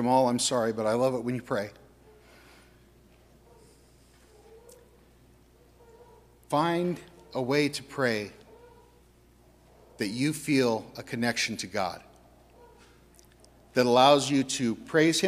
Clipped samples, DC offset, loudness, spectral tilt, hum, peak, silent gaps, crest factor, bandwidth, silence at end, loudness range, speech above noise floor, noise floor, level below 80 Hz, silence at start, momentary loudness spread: under 0.1%; under 0.1%; -27 LUFS; -4 dB/octave; none; -8 dBFS; none; 22 dB; 15.5 kHz; 0 s; 8 LU; 33 dB; -59 dBFS; -62 dBFS; 0 s; 12 LU